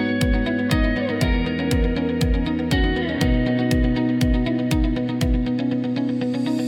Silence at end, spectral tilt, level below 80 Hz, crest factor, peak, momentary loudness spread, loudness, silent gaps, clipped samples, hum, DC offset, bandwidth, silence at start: 0 s; -6.5 dB/octave; -26 dBFS; 14 dB; -6 dBFS; 3 LU; -21 LUFS; none; under 0.1%; none; under 0.1%; 17 kHz; 0 s